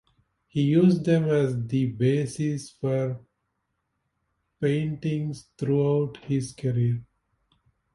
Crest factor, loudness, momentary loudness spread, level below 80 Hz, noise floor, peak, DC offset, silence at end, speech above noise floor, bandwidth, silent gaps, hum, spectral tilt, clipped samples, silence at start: 16 dB; -26 LUFS; 11 LU; -60 dBFS; -77 dBFS; -10 dBFS; under 0.1%; 0.9 s; 53 dB; 11.5 kHz; none; none; -8 dB/octave; under 0.1%; 0.55 s